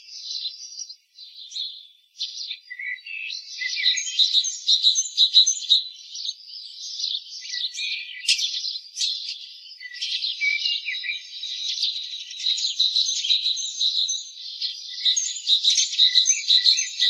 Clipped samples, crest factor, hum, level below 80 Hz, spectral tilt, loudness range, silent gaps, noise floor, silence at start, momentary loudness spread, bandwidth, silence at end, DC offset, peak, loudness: under 0.1%; 22 dB; none; -84 dBFS; 12.5 dB/octave; 8 LU; none; -45 dBFS; 0.05 s; 17 LU; 14 kHz; 0 s; under 0.1%; -2 dBFS; -21 LUFS